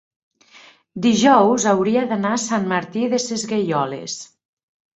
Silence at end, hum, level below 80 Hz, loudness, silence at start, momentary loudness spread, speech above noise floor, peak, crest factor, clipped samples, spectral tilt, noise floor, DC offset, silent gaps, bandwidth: 0.7 s; none; -62 dBFS; -18 LUFS; 0.95 s; 13 LU; 30 dB; -2 dBFS; 18 dB; under 0.1%; -4.5 dB/octave; -49 dBFS; under 0.1%; none; 8.4 kHz